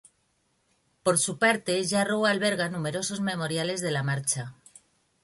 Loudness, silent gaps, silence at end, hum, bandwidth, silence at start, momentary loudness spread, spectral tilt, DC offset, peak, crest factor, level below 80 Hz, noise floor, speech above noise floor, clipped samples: -26 LUFS; none; 0.7 s; none; 12 kHz; 1.05 s; 7 LU; -3.5 dB/octave; under 0.1%; -10 dBFS; 20 dB; -68 dBFS; -71 dBFS; 45 dB; under 0.1%